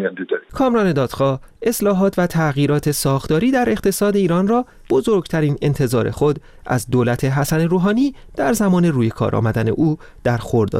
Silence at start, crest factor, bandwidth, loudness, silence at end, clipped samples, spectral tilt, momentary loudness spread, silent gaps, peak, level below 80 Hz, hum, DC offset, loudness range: 0 s; 10 dB; 16 kHz; -18 LUFS; 0 s; under 0.1%; -6.5 dB/octave; 6 LU; none; -6 dBFS; -42 dBFS; none; 0.2%; 1 LU